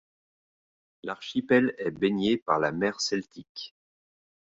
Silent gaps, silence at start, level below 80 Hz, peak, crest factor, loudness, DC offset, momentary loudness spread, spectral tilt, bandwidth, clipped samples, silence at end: 2.42-2.46 s, 3.49-3.55 s; 1.05 s; -66 dBFS; -8 dBFS; 22 dB; -27 LUFS; under 0.1%; 17 LU; -4.5 dB/octave; 7.8 kHz; under 0.1%; 0.9 s